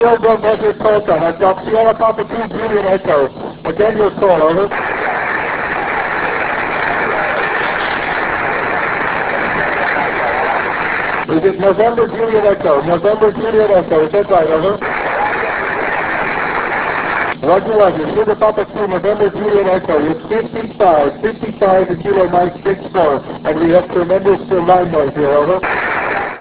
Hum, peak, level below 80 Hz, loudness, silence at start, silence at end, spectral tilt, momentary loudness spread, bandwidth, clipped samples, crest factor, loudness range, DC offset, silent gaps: none; 0 dBFS; -42 dBFS; -14 LUFS; 0 s; 0 s; -9.5 dB/octave; 5 LU; 4 kHz; under 0.1%; 14 dB; 2 LU; under 0.1%; none